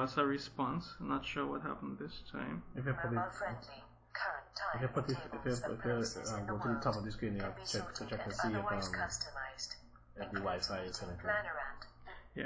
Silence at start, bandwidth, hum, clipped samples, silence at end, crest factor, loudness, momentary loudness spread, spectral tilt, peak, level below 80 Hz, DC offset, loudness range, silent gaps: 0 s; 8 kHz; none; under 0.1%; 0 s; 20 dB; -39 LUFS; 10 LU; -5 dB/octave; -20 dBFS; -58 dBFS; under 0.1%; 2 LU; none